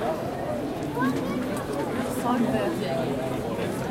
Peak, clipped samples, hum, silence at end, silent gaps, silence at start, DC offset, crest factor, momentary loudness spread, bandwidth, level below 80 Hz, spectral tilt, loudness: -12 dBFS; under 0.1%; none; 0 s; none; 0 s; under 0.1%; 16 dB; 5 LU; 16.5 kHz; -50 dBFS; -6 dB/octave; -28 LUFS